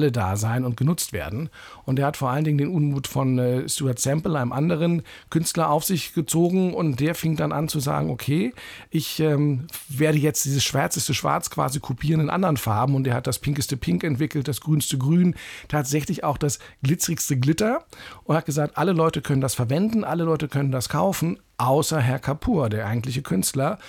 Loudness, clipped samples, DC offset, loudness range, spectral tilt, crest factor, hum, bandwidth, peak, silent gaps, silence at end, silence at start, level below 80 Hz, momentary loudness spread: -23 LUFS; under 0.1%; under 0.1%; 1 LU; -5.5 dB/octave; 14 dB; none; 18.5 kHz; -8 dBFS; none; 0 s; 0 s; -50 dBFS; 6 LU